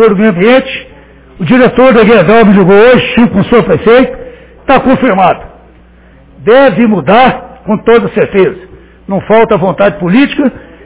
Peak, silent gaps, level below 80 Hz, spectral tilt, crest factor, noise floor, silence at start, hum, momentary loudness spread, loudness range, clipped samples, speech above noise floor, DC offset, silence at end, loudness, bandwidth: 0 dBFS; none; -34 dBFS; -10.5 dB/octave; 6 dB; -38 dBFS; 0 s; none; 13 LU; 4 LU; 4%; 32 dB; under 0.1%; 0.25 s; -7 LUFS; 4 kHz